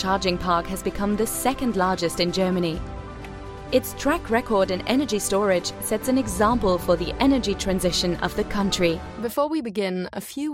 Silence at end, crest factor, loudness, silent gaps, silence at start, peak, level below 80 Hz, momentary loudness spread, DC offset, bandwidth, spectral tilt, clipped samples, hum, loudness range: 0 s; 18 dB; -23 LUFS; none; 0 s; -6 dBFS; -40 dBFS; 8 LU; under 0.1%; 16.5 kHz; -4.5 dB/octave; under 0.1%; none; 2 LU